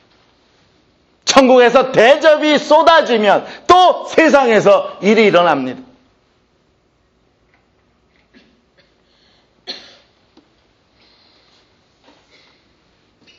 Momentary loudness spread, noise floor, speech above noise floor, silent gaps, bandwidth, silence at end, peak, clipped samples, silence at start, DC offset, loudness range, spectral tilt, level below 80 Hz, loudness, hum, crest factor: 16 LU; -59 dBFS; 48 dB; none; 9.4 kHz; 3.6 s; 0 dBFS; under 0.1%; 1.25 s; under 0.1%; 8 LU; -3.5 dB/octave; -54 dBFS; -11 LUFS; none; 16 dB